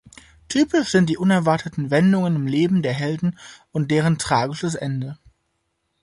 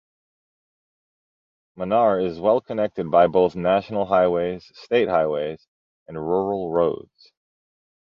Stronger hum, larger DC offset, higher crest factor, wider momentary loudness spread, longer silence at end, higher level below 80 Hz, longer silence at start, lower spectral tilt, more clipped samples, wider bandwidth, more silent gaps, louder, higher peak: neither; neither; about the same, 16 dB vs 18 dB; second, 9 LU vs 14 LU; second, 0.9 s vs 1.05 s; about the same, -54 dBFS vs -56 dBFS; second, 0.5 s vs 1.75 s; second, -6 dB/octave vs -8 dB/octave; neither; first, 11.5 kHz vs 6.8 kHz; second, none vs 5.68-6.06 s; about the same, -21 LUFS vs -21 LUFS; about the same, -4 dBFS vs -4 dBFS